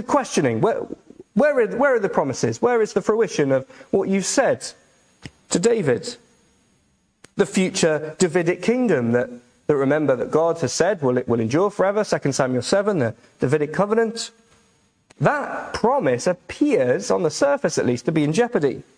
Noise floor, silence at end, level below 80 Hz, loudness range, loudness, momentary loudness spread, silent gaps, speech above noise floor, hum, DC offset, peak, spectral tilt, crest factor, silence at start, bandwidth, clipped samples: -64 dBFS; 0.15 s; -58 dBFS; 3 LU; -21 LUFS; 6 LU; none; 44 dB; none; under 0.1%; -2 dBFS; -5 dB/octave; 18 dB; 0 s; 10.5 kHz; under 0.1%